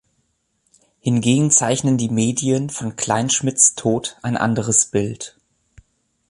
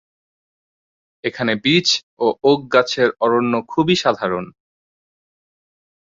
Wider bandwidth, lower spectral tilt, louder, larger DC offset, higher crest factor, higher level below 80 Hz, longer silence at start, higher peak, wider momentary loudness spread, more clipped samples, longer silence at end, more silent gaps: first, 11.5 kHz vs 7.8 kHz; about the same, -4 dB/octave vs -4.5 dB/octave; about the same, -18 LUFS vs -18 LUFS; neither; about the same, 20 dB vs 18 dB; about the same, -54 dBFS vs -58 dBFS; second, 1.05 s vs 1.25 s; about the same, 0 dBFS vs -2 dBFS; about the same, 11 LU vs 10 LU; neither; second, 1 s vs 1.55 s; second, none vs 2.03-2.17 s